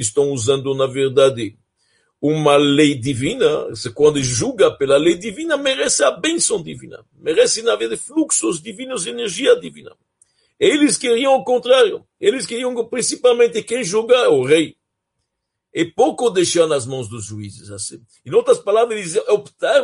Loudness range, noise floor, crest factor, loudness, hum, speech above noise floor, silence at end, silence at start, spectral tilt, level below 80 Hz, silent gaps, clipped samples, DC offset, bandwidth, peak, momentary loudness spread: 3 LU; -77 dBFS; 16 dB; -17 LUFS; none; 61 dB; 0 s; 0 s; -3.5 dB/octave; -56 dBFS; none; under 0.1%; under 0.1%; 11.5 kHz; -2 dBFS; 13 LU